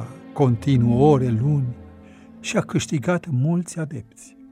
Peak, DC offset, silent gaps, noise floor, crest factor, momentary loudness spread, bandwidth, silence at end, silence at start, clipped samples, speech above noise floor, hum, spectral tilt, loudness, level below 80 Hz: -4 dBFS; under 0.1%; none; -45 dBFS; 18 dB; 16 LU; 11.5 kHz; 0.3 s; 0 s; under 0.1%; 24 dB; none; -7 dB/octave; -21 LUFS; -50 dBFS